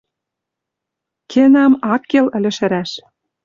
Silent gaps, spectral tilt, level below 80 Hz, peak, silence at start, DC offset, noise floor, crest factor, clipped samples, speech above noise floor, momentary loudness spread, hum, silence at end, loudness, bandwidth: none; -6 dB/octave; -60 dBFS; -2 dBFS; 1.3 s; under 0.1%; -81 dBFS; 14 dB; under 0.1%; 68 dB; 12 LU; none; 0.45 s; -14 LUFS; 7.4 kHz